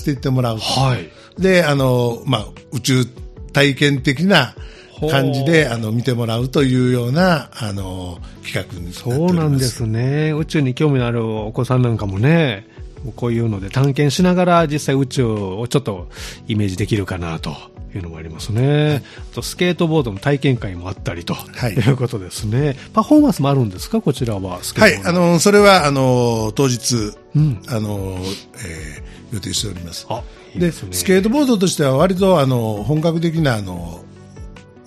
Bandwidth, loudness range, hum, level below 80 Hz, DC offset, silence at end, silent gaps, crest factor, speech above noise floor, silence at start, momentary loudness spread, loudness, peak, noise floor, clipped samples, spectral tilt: 14.5 kHz; 7 LU; none; -40 dBFS; under 0.1%; 0.25 s; none; 18 dB; 19 dB; 0 s; 16 LU; -17 LUFS; 0 dBFS; -36 dBFS; under 0.1%; -5.5 dB/octave